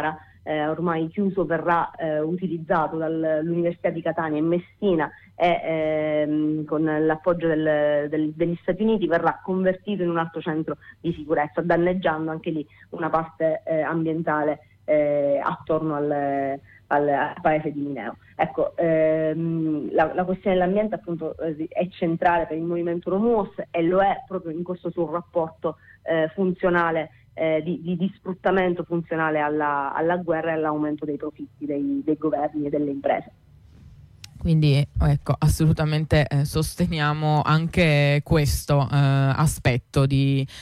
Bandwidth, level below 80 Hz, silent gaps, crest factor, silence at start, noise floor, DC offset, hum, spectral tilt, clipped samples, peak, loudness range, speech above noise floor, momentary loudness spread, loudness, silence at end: 14.5 kHz; -42 dBFS; none; 14 dB; 0 s; -49 dBFS; under 0.1%; none; -7 dB/octave; under 0.1%; -8 dBFS; 4 LU; 26 dB; 9 LU; -23 LUFS; 0 s